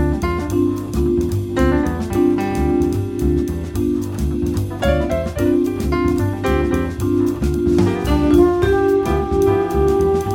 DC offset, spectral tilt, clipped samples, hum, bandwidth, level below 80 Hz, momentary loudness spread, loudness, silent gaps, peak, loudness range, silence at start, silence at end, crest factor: under 0.1%; -7.5 dB/octave; under 0.1%; none; 17 kHz; -26 dBFS; 5 LU; -18 LUFS; none; -2 dBFS; 3 LU; 0 s; 0 s; 14 dB